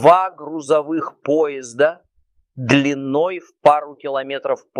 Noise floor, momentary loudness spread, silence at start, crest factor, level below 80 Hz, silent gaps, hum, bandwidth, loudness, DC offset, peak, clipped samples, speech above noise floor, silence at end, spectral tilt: -62 dBFS; 9 LU; 0 s; 18 dB; -62 dBFS; none; none; 11 kHz; -19 LUFS; under 0.1%; 0 dBFS; under 0.1%; 44 dB; 0 s; -5.5 dB/octave